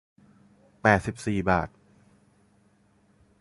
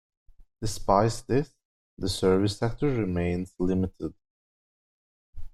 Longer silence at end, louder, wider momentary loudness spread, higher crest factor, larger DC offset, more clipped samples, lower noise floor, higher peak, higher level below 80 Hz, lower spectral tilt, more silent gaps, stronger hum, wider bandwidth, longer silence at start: first, 1.75 s vs 0.05 s; about the same, -25 LUFS vs -27 LUFS; second, 7 LU vs 12 LU; about the same, 26 dB vs 22 dB; neither; neither; second, -63 dBFS vs under -90 dBFS; about the same, -4 dBFS vs -6 dBFS; second, -50 dBFS vs -44 dBFS; about the same, -6.5 dB/octave vs -6 dB/octave; second, none vs 1.65-1.97 s, 4.30-5.33 s; neither; second, 11.5 kHz vs 14 kHz; first, 0.85 s vs 0.4 s